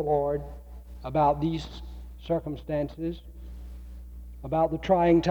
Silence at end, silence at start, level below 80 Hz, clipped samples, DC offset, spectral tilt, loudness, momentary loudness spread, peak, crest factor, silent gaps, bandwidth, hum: 0 s; 0 s; -42 dBFS; under 0.1%; under 0.1%; -8 dB/octave; -27 LUFS; 21 LU; -10 dBFS; 16 dB; none; 19.5 kHz; none